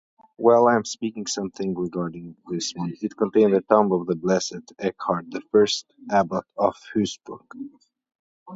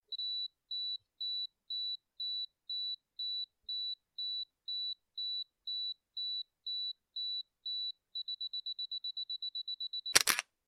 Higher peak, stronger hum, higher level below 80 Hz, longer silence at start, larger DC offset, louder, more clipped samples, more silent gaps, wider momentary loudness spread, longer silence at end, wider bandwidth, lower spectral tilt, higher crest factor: about the same, -4 dBFS vs -2 dBFS; neither; first, -62 dBFS vs -78 dBFS; first, 0.4 s vs 0.1 s; neither; first, -23 LUFS vs -37 LUFS; neither; first, 8.15-8.46 s vs none; first, 14 LU vs 3 LU; second, 0 s vs 0.25 s; second, 8 kHz vs 12 kHz; first, -5 dB/octave vs 2 dB/octave; second, 20 dB vs 38 dB